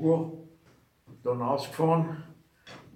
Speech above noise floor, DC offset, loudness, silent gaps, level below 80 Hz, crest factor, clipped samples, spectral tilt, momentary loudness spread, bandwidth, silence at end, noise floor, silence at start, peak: 35 dB; under 0.1%; -29 LUFS; none; -72 dBFS; 18 dB; under 0.1%; -8 dB/octave; 22 LU; 14.5 kHz; 0.15 s; -62 dBFS; 0 s; -12 dBFS